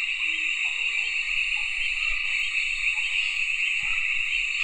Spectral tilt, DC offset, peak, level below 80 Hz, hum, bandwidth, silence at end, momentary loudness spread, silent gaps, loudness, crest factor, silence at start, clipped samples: 2 dB/octave; under 0.1%; -12 dBFS; -46 dBFS; none; 9.6 kHz; 0 s; 1 LU; none; -24 LUFS; 14 dB; 0 s; under 0.1%